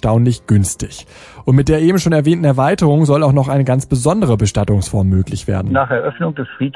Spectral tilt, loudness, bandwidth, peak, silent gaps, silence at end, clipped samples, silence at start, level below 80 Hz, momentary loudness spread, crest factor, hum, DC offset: -7 dB/octave; -14 LUFS; 12 kHz; -2 dBFS; none; 0.05 s; under 0.1%; 0.05 s; -36 dBFS; 9 LU; 12 dB; none; under 0.1%